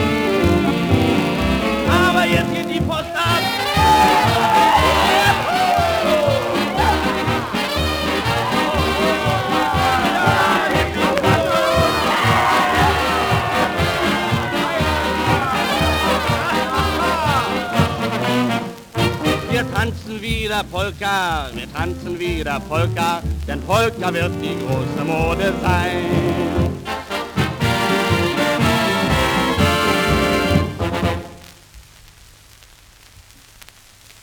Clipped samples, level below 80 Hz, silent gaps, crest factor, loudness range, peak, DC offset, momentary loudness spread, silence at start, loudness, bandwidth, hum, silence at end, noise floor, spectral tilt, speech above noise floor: under 0.1%; -34 dBFS; none; 18 dB; 6 LU; 0 dBFS; under 0.1%; 7 LU; 0 s; -18 LUFS; over 20 kHz; none; 2.4 s; -46 dBFS; -5 dB/octave; 26 dB